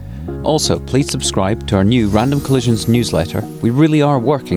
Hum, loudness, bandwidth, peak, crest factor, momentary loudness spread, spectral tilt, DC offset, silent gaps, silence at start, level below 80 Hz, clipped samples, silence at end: none; -15 LUFS; 16.5 kHz; -2 dBFS; 12 dB; 6 LU; -5.5 dB/octave; under 0.1%; none; 0 s; -34 dBFS; under 0.1%; 0 s